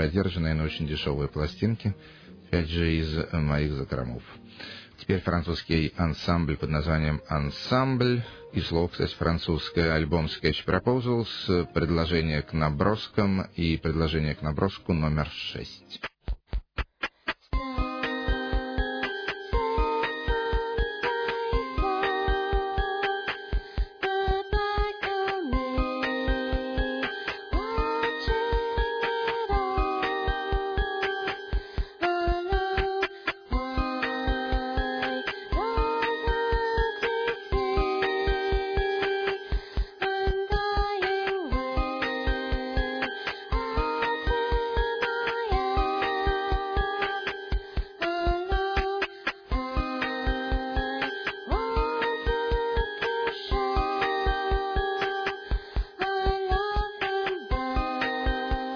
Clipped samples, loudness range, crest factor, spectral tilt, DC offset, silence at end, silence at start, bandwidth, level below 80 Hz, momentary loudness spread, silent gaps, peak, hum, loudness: under 0.1%; 3 LU; 20 dB; -7 dB/octave; under 0.1%; 0 s; 0 s; 5.4 kHz; -34 dBFS; 6 LU; none; -8 dBFS; none; -28 LUFS